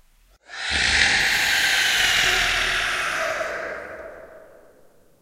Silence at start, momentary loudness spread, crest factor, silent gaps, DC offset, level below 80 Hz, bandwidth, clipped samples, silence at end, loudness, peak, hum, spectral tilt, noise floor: 0.5 s; 18 LU; 22 dB; none; under 0.1%; -44 dBFS; 16 kHz; under 0.1%; 0.8 s; -19 LUFS; -2 dBFS; none; 0 dB/octave; -54 dBFS